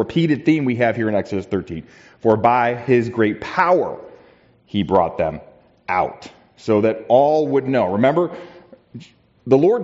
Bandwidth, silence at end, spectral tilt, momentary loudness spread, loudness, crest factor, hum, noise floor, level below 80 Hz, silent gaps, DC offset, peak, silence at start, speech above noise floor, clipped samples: 7.8 kHz; 0 s; -6 dB/octave; 17 LU; -18 LUFS; 16 dB; none; -51 dBFS; -56 dBFS; none; under 0.1%; -2 dBFS; 0 s; 34 dB; under 0.1%